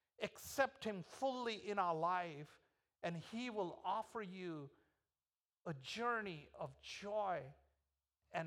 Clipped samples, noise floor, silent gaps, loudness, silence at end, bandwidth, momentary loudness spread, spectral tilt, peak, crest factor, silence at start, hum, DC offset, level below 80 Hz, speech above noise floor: under 0.1%; under -90 dBFS; none; -44 LUFS; 0 s; 16 kHz; 12 LU; -4.5 dB/octave; -24 dBFS; 22 dB; 0.2 s; none; under 0.1%; -80 dBFS; over 46 dB